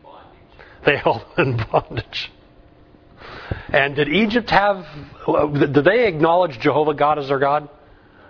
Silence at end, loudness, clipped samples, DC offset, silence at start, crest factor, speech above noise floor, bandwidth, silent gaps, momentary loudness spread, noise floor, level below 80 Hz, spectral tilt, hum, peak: 0.6 s; -18 LUFS; under 0.1%; under 0.1%; 0.1 s; 20 dB; 31 dB; 5.4 kHz; none; 12 LU; -49 dBFS; -44 dBFS; -7.5 dB/octave; none; 0 dBFS